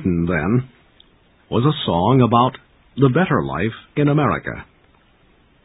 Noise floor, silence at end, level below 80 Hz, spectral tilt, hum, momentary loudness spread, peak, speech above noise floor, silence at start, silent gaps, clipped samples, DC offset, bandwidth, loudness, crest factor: -55 dBFS; 1 s; -42 dBFS; -12.5 dB/octave; none; 10 LU; 0 dBFS; 37 dB; 0 s; none; under 0.1%; under 0.1%; 4 kHz; -18 LUFS; 18 dB